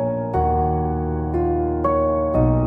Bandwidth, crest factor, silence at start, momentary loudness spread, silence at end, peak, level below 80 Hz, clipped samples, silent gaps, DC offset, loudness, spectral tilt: 3.2 kHz; 14 dB; 0 s; 4 LU; 0 s; -6 dBFS; -28 dBFS; under 0.1%; none; under 0.1%; -21 LUFS; -12 dB/octave